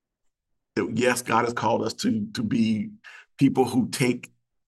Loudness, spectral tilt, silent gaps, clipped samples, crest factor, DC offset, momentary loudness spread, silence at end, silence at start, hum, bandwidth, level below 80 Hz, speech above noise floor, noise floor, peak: -25 LUFS; -5 dB/octave; none; under 0.1%; 18 dB; under 0.1%; 8 LU; 0.4 s; 0.75 s; none; 12.5 kHz; -66 dBFS; 51 dB; -75 dBFS; -6 dBFS